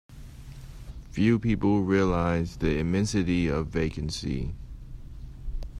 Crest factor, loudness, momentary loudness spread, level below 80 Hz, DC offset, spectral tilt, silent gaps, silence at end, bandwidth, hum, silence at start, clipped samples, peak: 16 dB; -27 LUFS; 22 LU; -38 dBFS; under 0.1%; -6.5 dB/octave; none; 0 s; 12.5 kHz; none; 0.1 s; under 0.1%; -10 dBFS